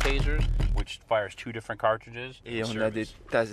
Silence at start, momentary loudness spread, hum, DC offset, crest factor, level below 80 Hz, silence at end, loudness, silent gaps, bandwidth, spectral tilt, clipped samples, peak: 0 s; 8 LU; none; under 0.1%; 18 dB; -32 dBFS; 0 s; -30 LUFS; none; 12 kHz; -5.5 dB/octave; under 0.1%; -10 dBFS